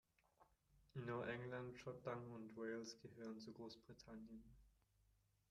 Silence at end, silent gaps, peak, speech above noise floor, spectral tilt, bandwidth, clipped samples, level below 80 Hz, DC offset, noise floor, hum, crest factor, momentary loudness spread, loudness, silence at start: 0.8 s; none; -34 dBFS; 28 dB; -6 dB/octave; 13 kHz; under 0.1%; -78 dBFS; under 0.1%; -81 dBFS; none; 20 dB; 11 LU; -53 LUFS; 0.4 s